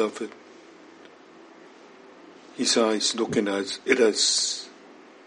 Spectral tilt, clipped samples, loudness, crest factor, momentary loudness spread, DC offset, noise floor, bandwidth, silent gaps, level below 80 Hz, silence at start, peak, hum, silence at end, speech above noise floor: -2 dB/octave; under 0.1%; -23 LUFS; 22 dB; 17 LU; under 0.1%; -49 dBFS; 11 kHz; none; -74 dBFS; 0 s; -4 dBFS; none; 0.35 s; 25 dB